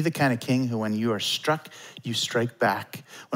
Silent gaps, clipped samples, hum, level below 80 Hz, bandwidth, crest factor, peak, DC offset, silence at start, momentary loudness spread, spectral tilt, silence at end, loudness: none; under 0.1%; none; -74 dBFS; 16 kHz; 16 dB; -10 dBFS; under 0.1%; 0 s; 14 LU; -4.5 dB/octave; 0 s; -26 LUFS